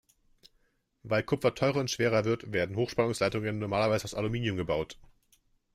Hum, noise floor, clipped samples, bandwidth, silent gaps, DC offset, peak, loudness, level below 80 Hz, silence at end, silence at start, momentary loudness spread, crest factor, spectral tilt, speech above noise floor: none; -72 dBFS; under 0.1%; 15.5 kHz; none; under 0.1%; -12 dBFS; -30 LUFS; -58 dBFS; 0.7 s; 1.05 s; 5 LU; 18 dB; -5.5 dB/octave; 42 dB